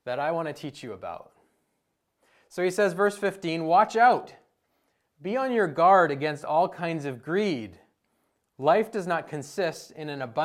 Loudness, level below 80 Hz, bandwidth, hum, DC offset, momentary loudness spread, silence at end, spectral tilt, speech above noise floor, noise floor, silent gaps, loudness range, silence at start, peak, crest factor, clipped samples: -25 LUFS; -74 dBFS; 14.5 kHz; none; under 0.1%; 18 LU; 0 s; -5.5 dB/octave; 52 dB; -77 dBFS; none; 6 LU; 0.05 s; -8 dBFS; 20 dB; under 0.1%